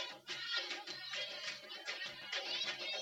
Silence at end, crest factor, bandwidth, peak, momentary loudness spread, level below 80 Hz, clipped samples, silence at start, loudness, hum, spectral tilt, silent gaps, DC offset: 0 s; 18 dB; 17 kHz; -26 dBFS; 6 LU; -90 dBFS; under 0.1%; 0 s; -41 LUFS; none; 0 dB/octave; none; under 0.1%